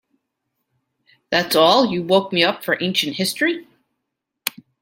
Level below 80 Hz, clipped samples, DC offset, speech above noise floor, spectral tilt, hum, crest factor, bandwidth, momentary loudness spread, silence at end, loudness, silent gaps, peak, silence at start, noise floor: -64 dBFS; under 0.1%; under 0.1%; 61 dB; -3.5 dB/octave; none; 20 dB; 16.5 kHz; 14 LU; 0.3 s; -18 LUFS; none; 0 dBFS; 1.3 s; -79 dBFS